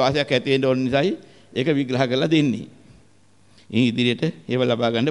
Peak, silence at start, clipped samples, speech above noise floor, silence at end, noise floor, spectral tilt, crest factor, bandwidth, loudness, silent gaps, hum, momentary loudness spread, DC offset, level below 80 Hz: -6 dBFS; 0 s; under 0.1%; 37 dB; 0 s; -57 dBFS; -6.5 dB/octave; 16 dB; 11 kHz; -21 LUFS; none; none; 7 LU; 0.2%; -56 dBFS